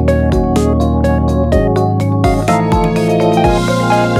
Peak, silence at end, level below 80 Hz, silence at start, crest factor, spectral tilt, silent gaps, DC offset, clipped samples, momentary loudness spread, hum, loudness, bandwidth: 0 dBFS; 0 s; -20 dBFS; 0 s; 12 dB; -7 dB/octave; none; under 0.1%; under 0.1%; 2 LU; none; -13 LUFS; 14.5 kHz